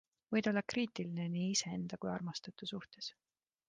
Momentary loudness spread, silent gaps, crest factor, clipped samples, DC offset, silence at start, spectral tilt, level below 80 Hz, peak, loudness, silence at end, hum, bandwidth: 10 LU; none; 18 dB; under 0.1%; under 0.1%; 0.3 s; -4.5 dB/octave; -76 dBFS; -20 dBFS; -39 LUFS; 0.55 s; none; 9.6 kHz